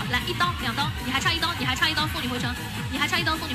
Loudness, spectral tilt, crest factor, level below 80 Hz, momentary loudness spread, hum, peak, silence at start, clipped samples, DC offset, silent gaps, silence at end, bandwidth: -25 LUFS; -3.5 dB/octave; 16 dB; -40 dBFS; 6 LU; none; -8 dBFS; 0 s; under 0.1%; under 0.1%; none; 0 s; 15.5 kHz